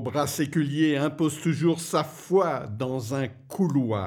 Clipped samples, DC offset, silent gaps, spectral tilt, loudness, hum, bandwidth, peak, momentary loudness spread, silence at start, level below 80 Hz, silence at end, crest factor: under 0.1%; under 0.1%; none; -6 dB/octave; -26 LUFS; none; 19 kHz; -10 dBFS; 7 LU; 0 s; -66 dBFS; 0 s; 16 dB